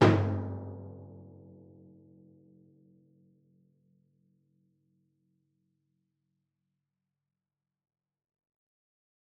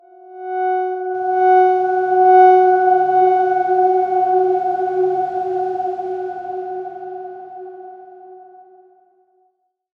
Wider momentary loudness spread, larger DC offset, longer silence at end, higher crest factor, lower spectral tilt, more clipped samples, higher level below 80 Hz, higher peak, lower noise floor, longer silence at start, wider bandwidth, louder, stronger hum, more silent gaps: first, 28 LU vs 20 LU; neither; first, 8.1 s vs 1.55 s; first, 28 dB vs 16 dB; about the same, -6.5 dB/octave vs -7 dB/octave; neither; about the same, -72 dBFS vs -68 dBFS; second, -8 dBFS vs -2 dBFS; first, under -90 dBFS vs -65 dBFS; second, 0 s vs 0.25 s; first, 6.6 kHz vs 4.7 kHz; second, -32 LUFS vs -16 LUFS; neither; neither